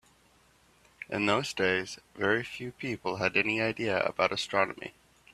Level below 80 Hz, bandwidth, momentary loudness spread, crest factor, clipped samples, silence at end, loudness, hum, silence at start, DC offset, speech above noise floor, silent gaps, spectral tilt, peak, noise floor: -66 dBFS; 14 kHz; 12 LU; 24 dB; under 0.1%; 0.45 s; -29 LUFS; none; 1 s; under 0.1%; 34 dB; none; -4.5 dB/octave; -8 dBFS; -64 dBFS